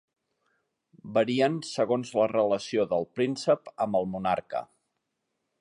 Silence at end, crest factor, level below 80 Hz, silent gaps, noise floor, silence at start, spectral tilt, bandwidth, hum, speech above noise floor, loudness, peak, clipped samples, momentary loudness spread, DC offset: 0.95 s; 18 dB; -68 dBFS; none; -81 dBFS; 1.05 s; -5.5 dB/octave; 11 kHz; none; 54 dB; -28 LUFS; -10 dBFS; under 0.1%; 5 LU; under 0.1%